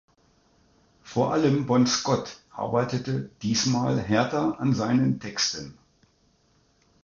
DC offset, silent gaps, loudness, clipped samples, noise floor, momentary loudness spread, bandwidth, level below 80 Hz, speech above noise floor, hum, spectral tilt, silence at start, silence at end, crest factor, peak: under 0.1%; none; -25 LUFS; under 0.1%; -65 dBFS; 9 LU; 7.4 kHz; -58 dBFS; 40 dB; none; -5 dB/octave; 1.05 s; 1.3 s; 18 dB; -10 dBFS